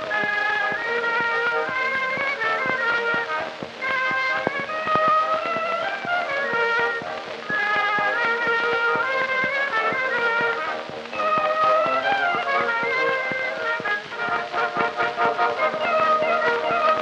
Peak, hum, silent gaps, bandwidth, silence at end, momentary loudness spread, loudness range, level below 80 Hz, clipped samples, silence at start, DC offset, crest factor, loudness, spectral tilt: -6 dBFS; none; none; 10 kHz; 0 s; 6 LU; 1 LU; -66 dBFS; under 0.1%; 0 s; under 0.1%; 18 dB; -22 LUFS; -3.5 dB/octave